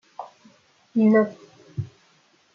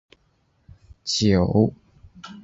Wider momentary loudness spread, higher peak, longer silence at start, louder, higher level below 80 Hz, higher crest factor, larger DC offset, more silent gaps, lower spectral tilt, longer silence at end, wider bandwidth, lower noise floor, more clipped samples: about the same, 23 LU vs 23 LU; second, -8 dBFS vs -4 dBFS; second, 0.2 s vs 1.05 s; about the same, -22 LUFS vs -21 LUFS; second, -68 dBFS vs -42 dBFS; about the same, 18 dB vs 20 dB; neither; neither; first, -9 dB/octave vs -5.5 dB/octave; first, 0.7 s vs 0.05 s; second, 6.6 kHz vs 8 kHz; second, -61 dBFS vs -65 dBFS; neither